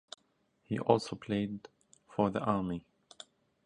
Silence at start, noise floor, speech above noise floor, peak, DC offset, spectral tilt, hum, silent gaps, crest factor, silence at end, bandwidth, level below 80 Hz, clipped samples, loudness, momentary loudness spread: 0.7 s; -74 dBFS; 42 dB; -10 dBFS; under 0.1%; -7 dB/octave; none; none; 26 dB; 0.85 s; 10.5 kHz; -64 dBFS; under 0.1%; -34 LUFS; 23 LU